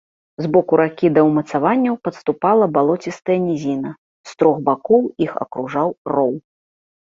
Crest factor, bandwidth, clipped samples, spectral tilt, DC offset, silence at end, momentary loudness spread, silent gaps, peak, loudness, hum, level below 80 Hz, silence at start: 16 dB; 7.6 kHz; under 0.1%; -8 dB/octave; under 0.1%; 0.65 s; 9 LU; 3.98-4.24 s, 5.98-6.05 s; -2 dBFS; -18 LUFS; none; -60 dBFS; 0.4 s